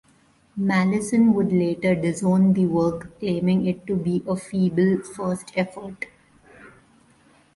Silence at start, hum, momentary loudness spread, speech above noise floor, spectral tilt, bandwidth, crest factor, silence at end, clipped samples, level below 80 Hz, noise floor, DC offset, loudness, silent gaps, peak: 0.55 s; none; 11 LU; 37 dB; -7.5 dB/octave; 11.5 kHz; 16 dB; 0.85 s; under 0.1%; -56 dBFS; -58 dBFS; under 0.1%; -22 LUFS; none; -8 dBFS